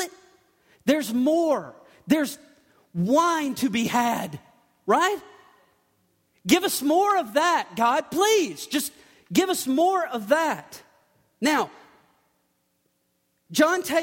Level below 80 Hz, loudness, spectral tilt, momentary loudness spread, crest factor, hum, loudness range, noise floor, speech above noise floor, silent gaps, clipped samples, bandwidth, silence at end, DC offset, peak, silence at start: -68 dBFS; -23 LUFS; -3.5 dB/octave; 13 LU; 20 dB; none; 4 LU; -72 dBFS; 49 dB; none; under 0.1%; 16.5 kHz; 0 s; under 0.1%; -6 dBFS; 0 s